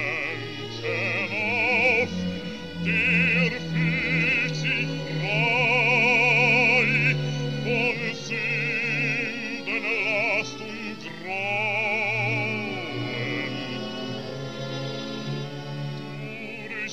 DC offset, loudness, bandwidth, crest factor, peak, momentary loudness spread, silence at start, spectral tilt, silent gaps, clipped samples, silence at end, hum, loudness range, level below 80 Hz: 0.5%; -24 LUFS; 13 kHz; 18 dB; -8 dBFS; 15 LU; 0 s; -5 dB/octave; none; under 0.1%; 0 s; none; 10 LU; -56 dBFS